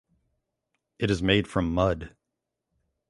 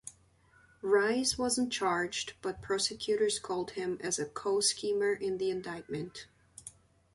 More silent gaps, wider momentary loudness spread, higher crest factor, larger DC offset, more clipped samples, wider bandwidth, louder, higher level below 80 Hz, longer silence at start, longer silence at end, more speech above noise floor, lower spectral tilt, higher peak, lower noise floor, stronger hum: neither; second, 11 LU vs 19 LU; about the same, 22 dB vs 18 dB; neither; neither; about the same, 11.5 kHz vs 11.5 kHz; first, -26 LUFS vs -32 LUFS; first, -44 dBFS vs -64 dBFS; first, 1 s vs 0.05 s; first, 1 s vs 0.45 s; first, 59 dB vs 32 dB; first, -6 dB/octave vs -2.5 dB/octave; first, -6 dBFS vs -14 dBFS; first, -84 dBFS vs -65 dBFS; neither